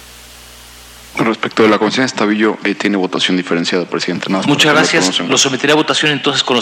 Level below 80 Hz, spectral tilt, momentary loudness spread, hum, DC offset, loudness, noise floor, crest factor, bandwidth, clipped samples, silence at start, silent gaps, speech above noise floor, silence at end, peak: -52 dBFS; -3 dB/octave; 7 LU; none; under 0.1%; -13 LUFS; -37 dBFS; 14 dB; 16.5 kHz; under 0.1%; 0 s; none; 23 dB; 0 s; 0 dBFS